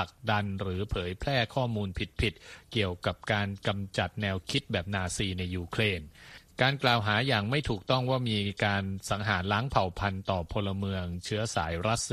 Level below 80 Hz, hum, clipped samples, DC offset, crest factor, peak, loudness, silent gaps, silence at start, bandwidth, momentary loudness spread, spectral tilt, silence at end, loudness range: -48 dBFS; none; under 0.1%; under 0.1%; 22 dB; -8 dBFS; -30 LUFS; none; 0 s; 13.5 kHz; 7 LU; -5 dB/octave; 0 s; 3 LU